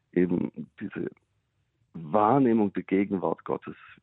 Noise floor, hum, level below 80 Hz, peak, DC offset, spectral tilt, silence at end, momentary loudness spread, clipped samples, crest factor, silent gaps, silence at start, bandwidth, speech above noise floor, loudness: -74 dBFS; none; -66 dBFS; -10 dBFS; under 0.1%; -11.5 dB/octave; 0.3 s; 17 LU; under 0.1%; 18 dB; none; 0.15 s; 4 kHz; 47 dB; -27 LUFS